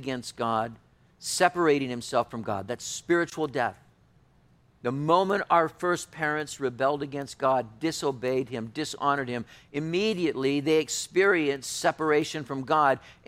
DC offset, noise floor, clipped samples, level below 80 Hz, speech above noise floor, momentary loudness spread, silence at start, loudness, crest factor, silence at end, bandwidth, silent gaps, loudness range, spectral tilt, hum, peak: under 0.1%; -61 dBFS; under 0.1%; -64 dBFS; 34 dB; 10 LU; 0 s; -27 LUFS; 22 dB; 0.15 s; 16 kHz; none; 3 LU; -4 dB/octave; none; -6 dBFS